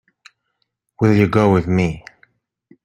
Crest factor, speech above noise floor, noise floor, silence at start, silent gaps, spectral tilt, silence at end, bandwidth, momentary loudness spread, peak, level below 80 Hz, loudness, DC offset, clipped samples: 18 dB; 57 dB; -72 dBFS; 1 s; none; -8 dB/octave; 0.85 s; 9.8 kHz; 8 LU; -2 dBFS; -46 dBFS; -16 LUFS; under 0.1%; under 0.1%